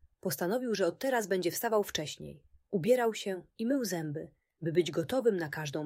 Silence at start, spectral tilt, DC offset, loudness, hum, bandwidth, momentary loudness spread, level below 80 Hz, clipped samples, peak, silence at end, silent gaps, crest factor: 0.25 s; -4.5 dB/octave; under 0.1%; -32 LUFS; none; 16 kHz; 11 LU; -68 dBFS; under 0.1%; -16 dBFS; 0 s; none; 18 dB